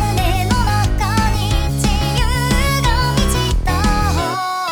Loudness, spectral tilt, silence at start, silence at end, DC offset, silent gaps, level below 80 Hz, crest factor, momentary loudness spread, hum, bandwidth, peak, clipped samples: -17 LUFS; -4.5 dB/octave; 0 s; 0 s; under 0.1%; none; -20 dBFS; 12 dB; 2 LU; none; over 20 kHz; -2 dBFS; under 0.1%